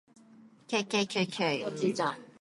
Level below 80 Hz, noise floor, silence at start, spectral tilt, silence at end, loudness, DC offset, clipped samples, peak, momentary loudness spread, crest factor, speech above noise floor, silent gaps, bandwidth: -80 dBFS; -57 dBFS; 0.4 s; -4 dB/octave; 0.1 s; -31 LUFS; under 0.1%; under 0.1%; -16 dBFS; 4 LU; 18 dB; 26 dB; none; 11.5 kHz